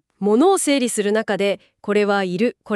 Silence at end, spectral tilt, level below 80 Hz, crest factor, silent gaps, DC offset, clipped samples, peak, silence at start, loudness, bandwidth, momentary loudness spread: 0 s; -4 dB/octave; -68 dBFS; 14 dB; none; under 0.1%; under 0.1%; -6 dBFS; 0.2 s; -19 LUFS; 13.5 kHz; 7 LU